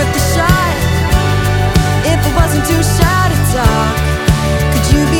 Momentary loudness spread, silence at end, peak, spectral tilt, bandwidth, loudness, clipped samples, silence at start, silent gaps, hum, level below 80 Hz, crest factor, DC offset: 2 LU; 0 s; 0 dBFS; -5 dB/octave; 19.5 kHz; -12 LUFS; under 0.1%; 0 s; none; none; -18 dBFS; 12 dB; under 0.1%